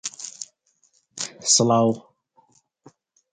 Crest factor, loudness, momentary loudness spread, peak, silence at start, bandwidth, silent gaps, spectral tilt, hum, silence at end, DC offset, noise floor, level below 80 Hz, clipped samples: 22 dB; -21 LUFS; 22 LU; -4 dBFS; 0.05 s; 9.6 kHz; none; -3.5 dB/octave; none; 1.35 s; under 0.1%; -65 dBFS; -68 dBFS; under 0.1%